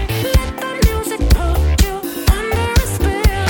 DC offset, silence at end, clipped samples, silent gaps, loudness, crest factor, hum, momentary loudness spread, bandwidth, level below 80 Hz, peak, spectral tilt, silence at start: under 0.1%; 0 s; under 0.1%; none; -17 LUFS; 12 dB; none; 3 LU; 17.5 kHz; -18 dBFS; -2 dBFS; -5 dB/octave; 0 s